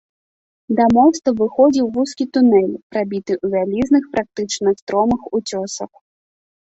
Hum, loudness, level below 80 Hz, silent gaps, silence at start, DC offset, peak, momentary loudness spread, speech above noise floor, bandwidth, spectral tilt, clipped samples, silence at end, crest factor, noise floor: none; -17 LUFS; -52 dBFS; 2.83-2.90 s, 4.82-4.87 s; 0.7 s; under 0.1%; -2 dBFS; 10 LU; over 73 dB; 8 kHz; -5.5 dB/octave; under 0.1%; 0.8 s; 16 dB; under -90 dBFS